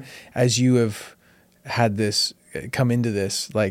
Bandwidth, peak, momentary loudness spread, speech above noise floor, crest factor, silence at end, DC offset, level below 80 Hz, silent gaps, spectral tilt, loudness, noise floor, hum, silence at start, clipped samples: 16 kHz; -4 dBFS; 14 LU; 33 dB; 18 dB; 0 s; under 0.1%; -60 dBFS; none; -5 dB/octave; -22 LUFS; -55 dBFS; none; 0 s; under 0.1%